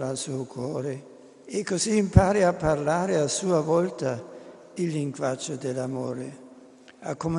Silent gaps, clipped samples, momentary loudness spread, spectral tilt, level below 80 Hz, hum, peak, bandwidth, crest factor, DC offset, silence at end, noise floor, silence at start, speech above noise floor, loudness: none; under 0.1%; 16 LU; -5.5 dB/octave; -42 dBFS; none; -2 dBFS; 11 kHz; 24 dB; under 0.1%; 0 s; -50 dBFS; 0 s; 25 dB; -26 LUFS